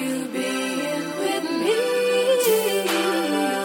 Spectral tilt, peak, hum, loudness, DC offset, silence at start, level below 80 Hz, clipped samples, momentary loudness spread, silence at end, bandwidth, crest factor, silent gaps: -3 dB/octave; -8 dBFS; none; -22 LUFS; under 0.1%; 0 s; -72 dBFS; under 0.1%; 7 LU; 0 s; 17 kHz; 14 dB; none